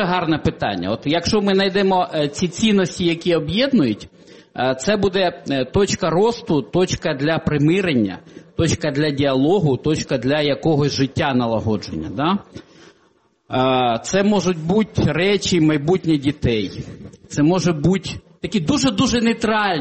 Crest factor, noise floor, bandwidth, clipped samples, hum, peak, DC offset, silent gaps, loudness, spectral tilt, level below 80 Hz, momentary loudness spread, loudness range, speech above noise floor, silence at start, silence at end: 14 dB; -59 dBFS; 8.8 kHz; under 0.1%; none; -4 dBFS; under 0.1%; none; -19 LUFS; -5.5 dB/octave; -44 dBFS; 6 LU; 2 LU; 41 dB; 0 s; 0 s